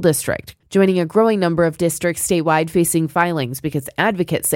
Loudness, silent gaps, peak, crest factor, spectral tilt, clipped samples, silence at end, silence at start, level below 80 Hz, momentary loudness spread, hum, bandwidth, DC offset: -18 LUFS; none; -2 dBFS; 16 dB; -5 dB/octave; under 0.1%; 0 s; 0 s; -50 dBFS; 7 LU; none; 17 kHz; under 0.1%